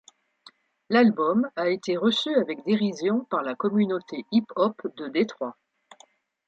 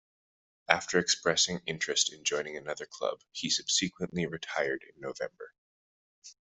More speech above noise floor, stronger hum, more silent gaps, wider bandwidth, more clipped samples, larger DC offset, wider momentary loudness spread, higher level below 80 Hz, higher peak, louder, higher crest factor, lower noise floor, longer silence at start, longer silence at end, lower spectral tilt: second, 35 dB vs over 58 dB; neither; second, none vs 5.58-6.22 s; about the same, 7.8 kHz vs 8.2 kHz; neither; neither; second, 8 LU vs 13 LU; about the same, -74 dBFS vs -70 dBFS; second, -8 dBFS vs -4 dBFS; first, -25 LUFS vs -30 LUFS; second, 18 dB vs 30 dB; second, -59 dBFS vs under -90 dBFS; first, 0.9 s vs 0.7 s; first, 0.95 s vs 0.1 s; first, -6 dB/octave vs -2 dB/octave